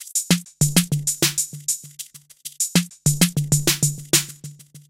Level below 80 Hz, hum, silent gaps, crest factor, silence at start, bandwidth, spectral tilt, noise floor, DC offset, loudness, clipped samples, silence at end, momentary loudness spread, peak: -52 dBFS; none; none; 22 dB; 0 s; 16.5 kHz; -3 dB/octave; -41 dBFS; under 0.1%; -20 LUFS; under 0.1%; 0.1 s; 19 LU; 0 dBFS